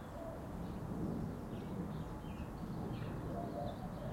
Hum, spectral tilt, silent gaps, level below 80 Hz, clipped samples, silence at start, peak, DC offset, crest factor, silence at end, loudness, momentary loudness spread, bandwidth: none; -8 dB/octave; none; -54 dBFS; under 0.1%; 0 s; -30 dBFS; under 0.1%; 14 dB; 0 s; -44 LUFS; 5 LU; 16.5 kHz